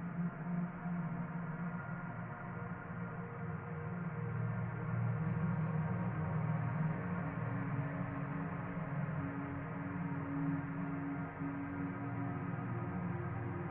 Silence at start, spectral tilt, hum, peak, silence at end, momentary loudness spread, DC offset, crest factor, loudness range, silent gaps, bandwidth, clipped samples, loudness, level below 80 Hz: 0 s; -9.5 dB/octave; none; -26 dBFS; 0 s; 7 LU; under 0.1%; 14 dB; 5 LU; none; 3.4 kHz; under 0.1%; -40 LUFS; -60 dBFS